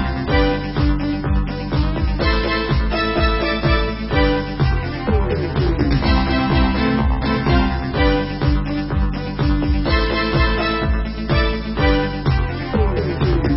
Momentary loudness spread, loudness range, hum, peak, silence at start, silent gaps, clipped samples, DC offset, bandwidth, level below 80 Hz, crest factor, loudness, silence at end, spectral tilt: 4 LU; 1 LU; none; -4 dBFS; 0 s; none; under 0.1%; under 0.1%; 5.8 kHz; -22 dBFS; 14 dB; -19 LUFS; 0 s; -11 dB/octave